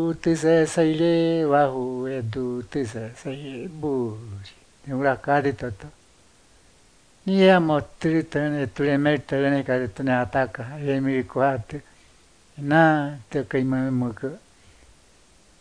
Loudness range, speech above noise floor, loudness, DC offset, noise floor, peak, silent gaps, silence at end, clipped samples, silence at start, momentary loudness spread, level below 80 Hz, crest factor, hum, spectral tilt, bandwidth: 6 LU; 34 dB; -23 LUFS; under 0.1%; -56 dBFS; -2 dBFS; none; 1.25 s; under 0.1%; 0 s; 15 LU; -54 dBFS; 20 dB; none; -6.5 dB/octave; 10.5 kHz